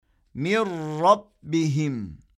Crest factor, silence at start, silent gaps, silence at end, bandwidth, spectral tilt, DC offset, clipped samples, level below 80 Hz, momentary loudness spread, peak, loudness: 20 dB; 0.35 s; none; 0.2 s; 12 kHz; -6.5 dB/octave; under 0.1%; under 0.1%; -58 dBFS; 11 LU; -6 dBFS; -24 LUFS